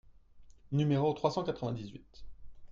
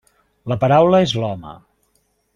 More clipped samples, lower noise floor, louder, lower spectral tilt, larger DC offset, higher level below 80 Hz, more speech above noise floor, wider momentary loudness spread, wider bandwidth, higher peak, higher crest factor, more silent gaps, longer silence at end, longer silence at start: neither; second, -55 dBFS vs -65 dBFS; second, -33 LUFS vs -16 LUFS; first, -8 dB/octave vs -6.5 dB/octave; neither; second, -58 dBFS vs -52 dBFS; second, 23 dB vs 49 dB; second, 16 LU vs 22 LU; second, 7.2 kHz vs 10.5 kHz; second, -16 dBFS vs -2 dBFS; about the same, 20 dB vs 16 dB; neither; second, 0 s vs 0.8 s; second, 0.1 s vs 0.45 s